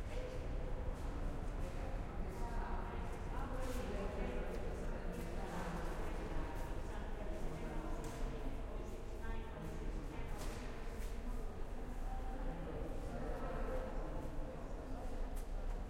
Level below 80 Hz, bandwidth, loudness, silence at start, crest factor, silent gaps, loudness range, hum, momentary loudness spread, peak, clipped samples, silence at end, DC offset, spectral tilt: -44 dBFS; 15 kHz; -47 LUFS; 0 s; 12 dB; none; 3 LU; none; 4 LU; -28 dBFS; under 0.1%; 0 s; under 0.1%; -6.5 dB/octave